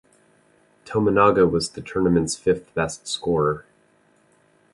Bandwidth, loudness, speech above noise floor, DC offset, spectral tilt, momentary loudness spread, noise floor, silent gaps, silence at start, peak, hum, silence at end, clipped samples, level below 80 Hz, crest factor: 11.5 kHz; -21 LUFS; 39 dB; under 0.1%; -5.5 dB/octave; 10 LU; -60 dBFS; none; 0.85 s; -4 dBFS; none; 1.1 s; under 0.1%; -48 dBFS; 20 dB